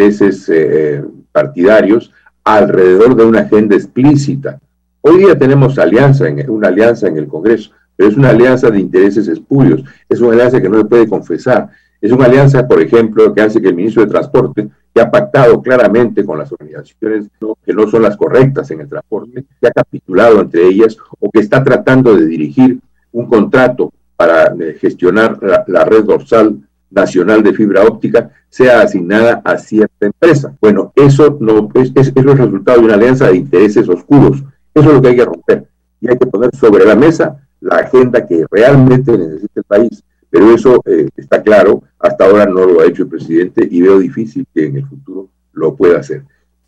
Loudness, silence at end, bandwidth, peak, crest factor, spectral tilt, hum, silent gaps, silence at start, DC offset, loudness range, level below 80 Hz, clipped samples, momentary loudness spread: -9 LUFS; 0.45 s; 9 kHz; 0 dBFS; 8 dB; -8 dB/octave; none; none; 0 s; under 0.1%; 3 LU; -42 dBFS; 1%; 11 LU